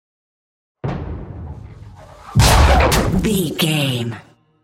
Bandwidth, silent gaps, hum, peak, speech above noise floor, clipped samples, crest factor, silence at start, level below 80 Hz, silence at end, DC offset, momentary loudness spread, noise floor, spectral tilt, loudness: 16.5 kHz; none; none; 0 dBFS; 20 dB; under 0.1%; 18 dB; 0.85 s; -24 dBFS; 0.45 s; under 0.1%; 21 LU; -39 dBFS; -4.5 dB/octave; -16 LUFS